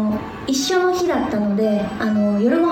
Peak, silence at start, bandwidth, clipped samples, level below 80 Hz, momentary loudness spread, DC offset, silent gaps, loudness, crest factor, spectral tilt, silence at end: -6 dBFS; 0 s; 16.5 kHz; under 0.1%; -48 dBFS; 5 LU; under 0.1%; none; -19 LUFS; 12 dB; -5 dB/octave; 0 s